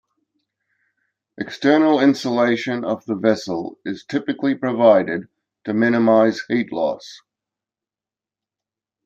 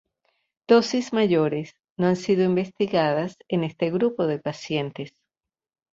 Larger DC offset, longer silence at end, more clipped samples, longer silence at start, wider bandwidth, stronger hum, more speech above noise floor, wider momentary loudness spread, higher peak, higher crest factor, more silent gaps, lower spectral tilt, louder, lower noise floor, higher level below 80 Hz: neither; first, 1.9 s vs 0.85 s; neither; first, 1.4 s vs 0.7 s; about the same, 8.4 kHz vs 7.8 kHz; neither; first, over 72 dB vs 63 dB; first, 15 LU vs 11 LU; first, -2 dBFS vs -6 dBFS; about the same, 18 dB vs 20 dB; second, none vs 1.90-1.96 s; about the same, -6 dB/octave vs -6.5 dB/octave; first, -19 LUFS vs -23 LUFS; first, under -90 dBFS vs -86 dBFS; about the same, -68 dBFS vs -66 dBFS